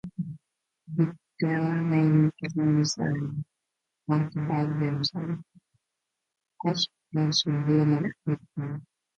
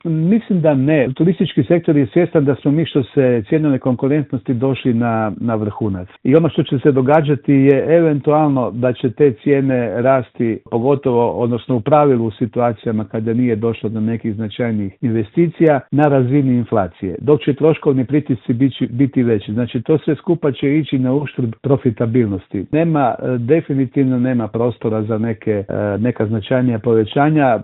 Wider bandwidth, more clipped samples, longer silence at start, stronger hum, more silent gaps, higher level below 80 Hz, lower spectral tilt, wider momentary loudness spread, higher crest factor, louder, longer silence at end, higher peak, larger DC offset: first, 7.8 kHz vs 4.1 kHz; neither; about the same, 0.05 s vs 0.05 s; neither; neither; second, -66 dBFS vs -54 dBFS; second, -6 dB/octave vs -11.5 dB/octave; first, 14 LU vs 7 LU; about the same, 18 dB vs 16 dB; second, -27 LUFS vs -16 LUFS; first, 0.35 s vs 0 s; second, -10 dBFS vs 0 dBFS; neither